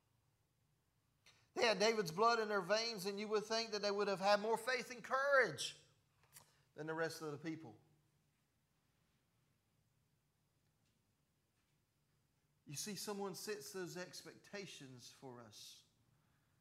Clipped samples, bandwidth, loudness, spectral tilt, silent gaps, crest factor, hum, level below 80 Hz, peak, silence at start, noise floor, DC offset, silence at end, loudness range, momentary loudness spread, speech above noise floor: under 0.1%; 16 kHz; -40 LUFS; -3 dB/octave; none; 22 dB; none; -88 dBFS; -20 dBFS; 1.55 s; -82 dBFS; under 0.1%; 0.8 s; 14 LU; 21 LU; 42 dB